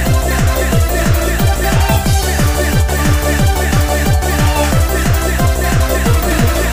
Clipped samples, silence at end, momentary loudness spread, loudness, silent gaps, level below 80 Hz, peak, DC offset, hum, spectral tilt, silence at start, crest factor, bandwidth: under 0.1%; 0 s; 1 LU; -13 LUFS; none; -16 dBFS; -2 dBFS; under 0.1%; none; -5 dB/octave; 0 s; 10 dB; 15.5 kHz